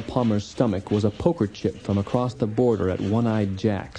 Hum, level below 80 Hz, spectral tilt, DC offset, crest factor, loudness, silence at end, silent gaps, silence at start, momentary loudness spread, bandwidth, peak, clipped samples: none; -50 dBFS; -8 dB/octave; under 0.1%; 18 dB; -24 LUFS; 0 s; none; 0 s; 4 LU; 10 kHz; -6 dBFS; under 0.1%